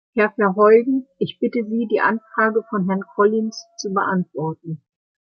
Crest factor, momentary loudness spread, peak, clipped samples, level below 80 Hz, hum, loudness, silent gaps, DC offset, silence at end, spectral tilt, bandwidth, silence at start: 16 dB; 13 LU; -2 dBFS; under 0.1%; -70 dBFS; none; -19 LUFS; none; under 0.1%; 0.55 s; -6.5 dB/octave; 6.8 kHz; 0.15 s